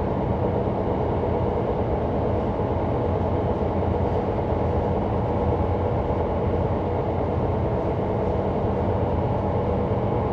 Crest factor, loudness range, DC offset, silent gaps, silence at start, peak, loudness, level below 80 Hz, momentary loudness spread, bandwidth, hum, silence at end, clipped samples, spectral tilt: 12 dB; 0 LU; under 0.1%; none; 0 s; -12 dBFS; -24 LUFS; -34 dBFS; 1 LU; 5.8 kHz; none; 0 s; under 0.1%; -10 dB/octave